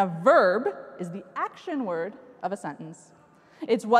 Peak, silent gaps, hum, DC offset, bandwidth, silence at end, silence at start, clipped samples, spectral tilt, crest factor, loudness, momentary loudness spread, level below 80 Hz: -6 dBFS; none; none; under 0.1%; 11.5 kHz; 0 s; 0 s; under 0.1%; -6 dB/octave; 20 dB; -27 LUFS; 18 LU; -78 dBFS